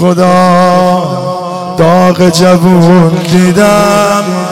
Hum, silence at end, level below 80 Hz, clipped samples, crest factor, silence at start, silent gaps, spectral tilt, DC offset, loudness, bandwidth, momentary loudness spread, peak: none; 0 s; -40 dBFS; 0.3%; 6 dB; 0 s; none; -6 dB/octave; 2%; -7 LUFS; 15.5 kHz; 8 LU; 0 dBFS